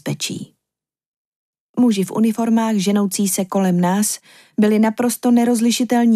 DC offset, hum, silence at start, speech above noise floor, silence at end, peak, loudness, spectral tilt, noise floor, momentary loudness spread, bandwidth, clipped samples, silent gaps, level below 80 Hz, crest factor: under 0.1%; none; 0.05 s; 69 dB; 0 s; -4 dBFS; -17 LUFS; -5 dB/octave; -86 dBFS; 9 LU; 15.5 kHz; under 0.1%; 1.06-1.53 s, 1.60-1.74 s; -70 dBFS; 14 dB